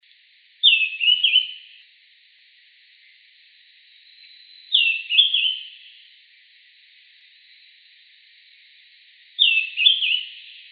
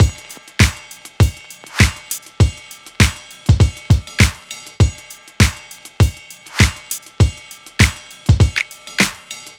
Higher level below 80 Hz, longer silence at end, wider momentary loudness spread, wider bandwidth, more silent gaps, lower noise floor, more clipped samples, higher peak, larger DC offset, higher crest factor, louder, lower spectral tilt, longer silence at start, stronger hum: second, under -90 dBFS vs -24 dBFS; about the same, 0.2 s vs 0.2 s; about the same, 21 LU vs 19 LU; second, 5 kHz vs 18 kHz; neither; first, -56 dBFS vs -38 dBFS; neither; about the same, -2 dBFS vs 0 dBFS; neither; first, 22 dB vs 16 dB; about the same, -17 LUFS vs -17 LUFS; second, 17 dB/octave vs -4.5 dB/octave; first, 0.65 s vs 0 s; neither